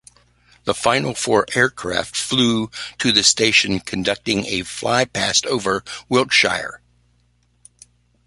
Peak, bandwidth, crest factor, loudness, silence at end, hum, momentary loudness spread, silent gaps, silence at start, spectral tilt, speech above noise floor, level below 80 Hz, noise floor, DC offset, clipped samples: 0 dBFS; 11.5 kHz; 20 dB; -18 LUFS; 1.5 s; 60 Hz at -45 dBFS; 10 LU; none; 0.65 s; -2.5 dB/octave; 42 dB; -50 dBFS; -61 dBFS; under 0.1%; under 0.1%